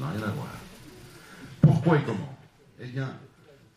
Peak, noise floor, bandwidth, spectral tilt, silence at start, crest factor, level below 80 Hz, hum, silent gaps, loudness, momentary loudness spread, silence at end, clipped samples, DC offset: -8 dBFS; -48 dBFS; 14 kHz; -8 dB/octave; 0 s; 22 dB; -56 dBFS; none; none; -26 LUFS; 26 LU; 0.5 s; under 0.1%; under 0.1%